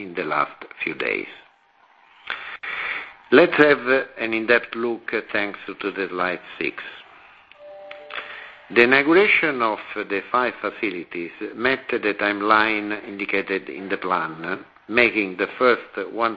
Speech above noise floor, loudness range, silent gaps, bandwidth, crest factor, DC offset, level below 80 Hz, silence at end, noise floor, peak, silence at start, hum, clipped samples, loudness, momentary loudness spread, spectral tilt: 35 dB; 8 LU; none; 5.2 kHz; 22 dB; under 0.1%; -62 dBFS; 0 s; -57 dBFS; 0 dBFS; 0 s; none; under 0.1%; -21 LUFS; 17 LU; -7 dB/octave